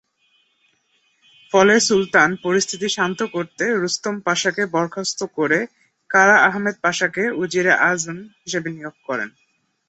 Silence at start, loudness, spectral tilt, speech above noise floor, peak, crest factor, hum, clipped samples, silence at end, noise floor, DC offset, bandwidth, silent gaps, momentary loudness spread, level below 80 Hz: 1.55 s; -18 LUFS; -3 dB/octave; 45 dB; 0 dBFS; 20 dB; none; under 0.1%; 0.6 s; -64 dBFS; under 0.1%; 8.4 kHz; none; 13 LU; -64 dBFS